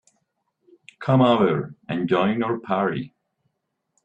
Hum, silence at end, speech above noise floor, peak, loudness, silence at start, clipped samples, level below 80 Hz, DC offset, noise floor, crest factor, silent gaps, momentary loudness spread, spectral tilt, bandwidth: none; 0.95 s; 56 dB; -6 dBFS; -22 LUFS; 1 s; under 0.1%; -62 dBFS; under 0.1%; -77 dBFS; 18 dB; none; 14 LU; -8.5 dB/octave; 8.4 kHz